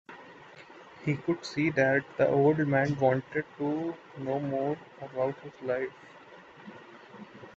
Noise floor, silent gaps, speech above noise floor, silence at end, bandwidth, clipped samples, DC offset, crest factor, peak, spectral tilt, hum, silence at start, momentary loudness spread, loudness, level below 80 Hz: -51 dBFS; none; 23 dB; 0.05 s; 7.8 kHz; under 0.1%; under 0.1%; 20 dB; -12 dBFS; -7.5 dB/octave; none; 0.1 s; 25 LU; -30 LUFS; -68 dBFS